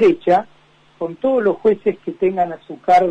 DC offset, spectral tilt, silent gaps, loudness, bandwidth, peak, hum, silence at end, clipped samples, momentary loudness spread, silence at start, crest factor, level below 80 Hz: under 0.1%; -7 dB/octave; none; -18 LUFS; 8.8 kHz; -4 dBFS; none; 0 s; under 0.1%; 10 LU; 0 s; 14 dB; -56 dBFS